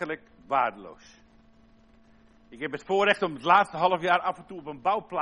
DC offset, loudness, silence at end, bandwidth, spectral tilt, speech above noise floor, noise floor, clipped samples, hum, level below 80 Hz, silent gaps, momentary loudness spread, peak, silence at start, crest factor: under 0.1%; -26 LUFS; 0 s; 10.5 kHz; -5 dB/octave; 31 dB; -57 dBFS; under 0.1%; none; -64 dBFS; none; 17 LU; -6 dBFS; 0 s; 22 dB